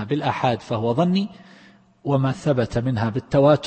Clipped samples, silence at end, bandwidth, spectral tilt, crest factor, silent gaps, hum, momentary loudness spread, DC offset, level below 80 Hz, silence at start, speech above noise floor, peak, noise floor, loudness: under 0.1%; 0 s; 8.6 kHz; -7.5 dB/octave; 16 dB; none; none; 5 LU; under 0.1%; -50 dBFS; 0 s; 31 dB; -6 dBFS; -51 dBFS; -22 LUFS